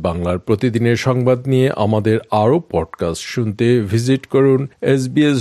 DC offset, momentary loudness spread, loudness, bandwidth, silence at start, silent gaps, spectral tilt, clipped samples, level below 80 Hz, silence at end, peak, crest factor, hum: under 0.1%; 7 LU; -16 LUFS; 13 kHz; 0 s; none; -7 dB/octave; under 0.1%; -48 dBFS; 0 s; 0 dBFS; 14 dB; none